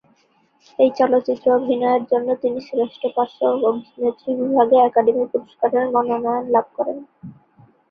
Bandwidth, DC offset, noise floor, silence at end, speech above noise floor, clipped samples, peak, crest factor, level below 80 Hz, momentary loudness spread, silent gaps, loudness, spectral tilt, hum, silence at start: 6 kHz; under 0.1%; -60 dBFS; 0.6 s; 42 dB; under 0.1%; -2 dBFS; 16 dB; -66 dBFS; 9 LU; none; -19 LUFS; -7.5 dB/octave; none; 0.8 s